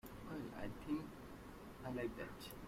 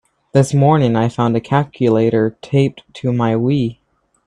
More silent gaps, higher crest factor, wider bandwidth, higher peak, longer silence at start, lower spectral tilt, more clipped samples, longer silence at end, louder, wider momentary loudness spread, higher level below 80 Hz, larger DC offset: neither; about the same, 16 dB vs 16 dB; first, 16 kHz vs 10.5 kHz; second, -32 dBFS vs 0 dBFS; second, 0.05 s vs 0.35 s; second, -6 dB/octave vs -7.5 dB/octave; neither; second, 0 s vs 0.55 s; second, -49 LUFS vs -16 LUFS; first, 10 LU vs 7 LU; second, -62 dBFS vs -52 dBFS; neither